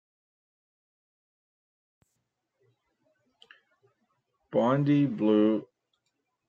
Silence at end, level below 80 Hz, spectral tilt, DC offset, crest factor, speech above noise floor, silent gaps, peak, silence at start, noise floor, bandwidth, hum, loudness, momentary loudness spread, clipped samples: 0.85 s; -80 dBFS; -9.5 dB/octave; under 0.1%; 20 dB; 57 dB; none; -12 dBFS; 4.5 s; -81 dBFS; 7 kHz; none; -26 LUFS; 7 LU; under 0.1%